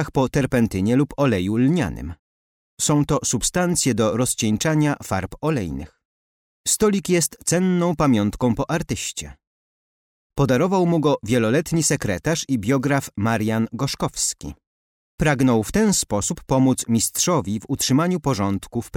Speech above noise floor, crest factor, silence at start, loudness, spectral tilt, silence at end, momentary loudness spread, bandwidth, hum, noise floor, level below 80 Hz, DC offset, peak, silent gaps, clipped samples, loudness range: over 70 dB; 14 dB; 0 s; -21 LUFS; -5 dB/octave; 0.1 s; 7 LU; 17 kHz; none; under -90 dBFS; -44 dBFS; under 0.1%; -8 dBFS; 2.19-2.77 s, 6.05-6.64 s, 9.47-10.30 s, 14.67-15.18 s; under 0.1%; 2 LU